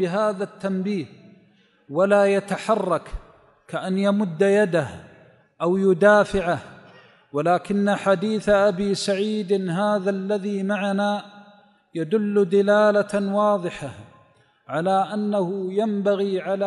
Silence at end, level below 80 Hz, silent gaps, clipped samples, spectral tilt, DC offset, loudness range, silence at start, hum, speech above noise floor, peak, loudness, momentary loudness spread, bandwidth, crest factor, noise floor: 0 s; -50 dBFS; none; under 0.1%; -6.5 dB/octave; under 0.1%; 3 LU; 0 s; none; 37 dB; -4 dBFS; -22 LUFS; 13 LU; 11.5 kHz; 18 dB; -58 dBFS